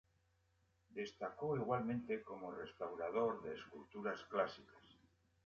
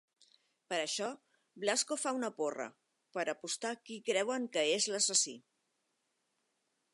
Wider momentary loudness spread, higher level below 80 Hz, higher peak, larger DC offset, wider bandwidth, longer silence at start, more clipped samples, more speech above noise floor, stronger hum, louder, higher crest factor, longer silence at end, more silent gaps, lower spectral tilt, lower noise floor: about the same, 11 LU vs 13 LU; first, -76 dBFS vs under -90 dBFS; second, -24 dBFS vs -16 dBFS; neither; second, 7 kHz vs 11.5 kHz; first, 0.9 s vs 0.7 s; neither; second, 35 dB vs 46 dB; neither; second, -44 LUFS vs -35 LUFS; about the same, 20 dB vs 22 dB; second, 0.55 s vs 1.55 s; neither; first, -5 dB/octave vs -1 dB/octave; about the same, -79 dBFS vs -82 dBFS